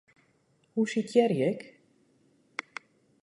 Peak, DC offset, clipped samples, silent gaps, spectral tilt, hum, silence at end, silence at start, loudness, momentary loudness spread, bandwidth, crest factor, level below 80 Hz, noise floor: -10 dBFS; under 0.1%; under 0.1%; none; -6 dB/octave; none; 0.6 s; 0.75 s; -29 LUFS; 20 LU; 11.5 kHz; 22 dB; -80 dBFS; -69 dBFS